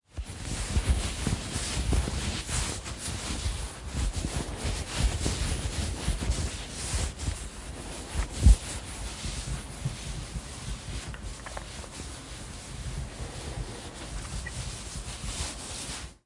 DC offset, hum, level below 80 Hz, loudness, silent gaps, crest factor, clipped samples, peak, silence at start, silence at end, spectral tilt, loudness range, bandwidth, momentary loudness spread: under 0.1%; none; -34 dBFS; -33 LUFS; none; 24 dB; under 0.1%; -8 dBFS; 0.15 s; 0.1 s; -4 dB/octave; 8 LU; 11.5 kHz; 10 LU